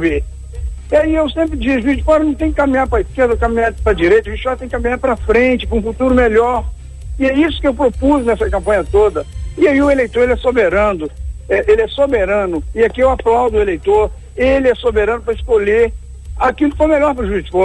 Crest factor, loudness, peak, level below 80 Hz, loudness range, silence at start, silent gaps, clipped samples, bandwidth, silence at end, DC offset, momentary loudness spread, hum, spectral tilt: 12 dB; -14 LUFS; -2 dBFS; -26 dBFS; 1 LU; 0 s; none; under 0.1%; 11 kHz; 0 s; under 0.1%; 8 LU; none; -7 dB/octave